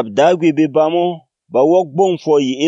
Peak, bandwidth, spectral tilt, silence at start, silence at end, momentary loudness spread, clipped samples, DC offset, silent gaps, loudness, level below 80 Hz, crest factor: 0 dBFS; 8 kHz; -6 dB/octave; 0 s; 0 s; 8 LU; under 0.1%; under 0.1%; none; -14 LUFS; -70 dBFS; 14 dB